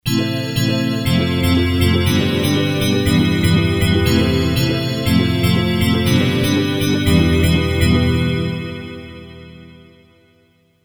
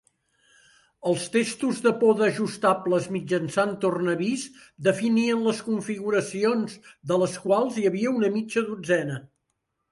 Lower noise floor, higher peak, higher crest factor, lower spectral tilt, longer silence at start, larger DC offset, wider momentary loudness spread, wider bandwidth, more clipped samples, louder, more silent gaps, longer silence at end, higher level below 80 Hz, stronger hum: second, -56 dBFS vs -78 dBFS; first, 0 dBFS vs -6 dBFS; about the same, 16 dB vs 18 dB; about the same, -6 dB/octave vs -5.5 dB/octave; second, 0.05 s vs 1.05 s; neither; about the same, 6 LU vs 6 LU; first, over 20 kHz vs 11.5 kHz; neither; first, -16 LUFS vs -25 LUFS; neither; first, 1.1 s vs 0.65 s; first, -30 dBFS vs -70 dBFS; neither